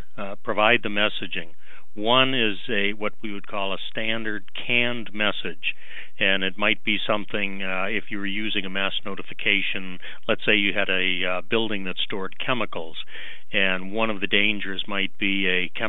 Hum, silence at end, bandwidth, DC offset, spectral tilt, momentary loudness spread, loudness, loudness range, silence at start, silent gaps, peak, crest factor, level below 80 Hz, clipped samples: none; 0 s; 12.5 kHz; 6%; -6.5 dB/octave; 13 LU; -24 LUFS; 3 LU; 0.15 s; none; -2 dBFS; 22 dB; -70 dBFS; under 0.1%